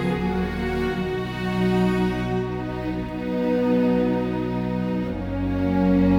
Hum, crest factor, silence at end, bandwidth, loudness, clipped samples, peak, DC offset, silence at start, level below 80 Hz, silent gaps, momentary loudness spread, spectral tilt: none; 14 dB; 0 s; 11 kHz; -24 LUFS; under 0.1%; -8 dBFS; under 0.1%; 0 s; -38 dBFS; none; 8 LU; -8 dB/octave